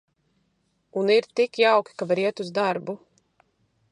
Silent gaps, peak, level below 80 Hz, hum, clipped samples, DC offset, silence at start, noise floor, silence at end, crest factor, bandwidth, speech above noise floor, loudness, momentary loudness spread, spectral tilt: none; -6 dBFS; -78 dBFS; none; under 0.1%; under 0.1%; 0.95 s; -71 dBFS; 0.95 s; 18 dB; 11 kHz; 48 dB; -23 LUFS; 13 LU; -5 dB/octave